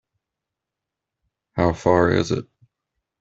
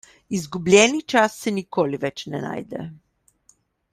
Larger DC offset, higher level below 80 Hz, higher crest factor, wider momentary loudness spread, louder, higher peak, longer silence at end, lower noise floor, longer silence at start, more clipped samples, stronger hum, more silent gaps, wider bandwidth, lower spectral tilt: neither; first, -50 dBFS vs -60 dBFS; about the same, 22 dB vs 22 dB; second, 10 LU vs 17 LU; about the same, -20 LUFS vs -21 LUFS; about the same, -2 dBFS vs 0 dBFS; second, 0.75 s vs 0.95 s; first, -85 dBFS vs -61 dBFS; first, 1.55 s vs 0.3 s; neither; neither; neither; second, 8 kHz vs 15 kHz; first, -6.5 dB/octave vs -4 dB/octave